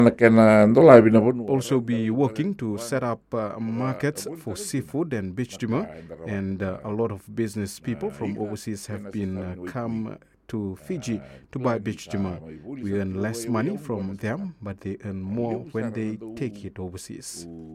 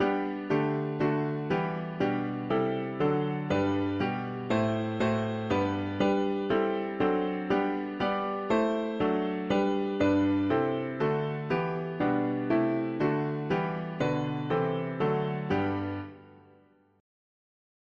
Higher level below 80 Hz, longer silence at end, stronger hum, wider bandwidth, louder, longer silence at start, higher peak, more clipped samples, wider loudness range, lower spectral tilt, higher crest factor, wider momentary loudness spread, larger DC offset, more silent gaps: about the same, -58 dBFS vs -60 dBFS; second, 0 s vs 1.7 s; neither; first, 15 kHz vs 7.4 kHz; first, -24 LUFS vs -29 LUFS; about the same, 0 s vs 0 s; first, 0 dBFS vs -14 dBFS; neither; first, 12 LU vs 3 LU; about the same, -7 dB/octave vs -8 dB/octave; first, 24 dB vs 16 dB; first, 19 LU vs 4 LU; neither; neither